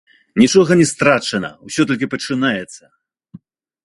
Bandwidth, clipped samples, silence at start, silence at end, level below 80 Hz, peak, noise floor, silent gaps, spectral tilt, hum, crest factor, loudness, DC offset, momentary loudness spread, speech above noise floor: 11.5 kHz; under 0.1%; 0.35 s; 1.1 s; -54 dBFS; 0 dBFS; -43 dBFS; none; -4.5 dB/octave; none; 18 dB; -16 LUFS; under 0.1%; 12 LU; 28 dB